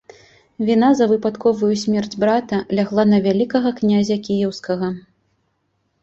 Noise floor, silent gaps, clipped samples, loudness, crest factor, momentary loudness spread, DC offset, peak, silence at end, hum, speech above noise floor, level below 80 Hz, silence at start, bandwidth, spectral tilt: -68 dBFS; none; under 0.1%; -18 LUFS; 16 dB; 8 LU; under 0.1%; -2 dBFS; 1.05 s; none; 51 dB; -58 dBFS; 0.6 s; 7.8 kHz; -6.5 dB/octave